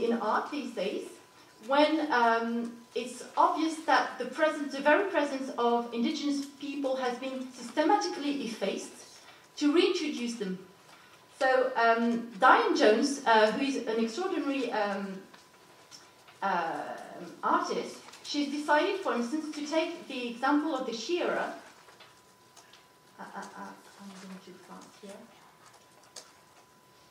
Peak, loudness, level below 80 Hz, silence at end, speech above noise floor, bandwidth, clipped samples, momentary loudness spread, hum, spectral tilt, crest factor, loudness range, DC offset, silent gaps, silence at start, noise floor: -8 dBFS; -29 LUFS; -86 dBFS; 0.85 s; 30 dB; 15.5 kHz; under 0.1%; 22 LU; none; -3.5 dB/octave; 22 dB; 21 LU; under 0.1%; none; 0 s; -59 dBFS